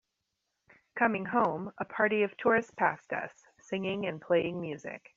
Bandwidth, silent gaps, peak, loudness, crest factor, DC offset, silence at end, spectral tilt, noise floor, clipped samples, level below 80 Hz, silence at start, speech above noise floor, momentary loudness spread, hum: 7.6 kHz; none; -12 dBFS; -31 LUFS; 20 dB; under 0.1%; 0.2 s; -4 dB/octave; -83 dBFS; under 0.1%; -72 dBFS; 0.95 s; 53 dB; 11 LU; none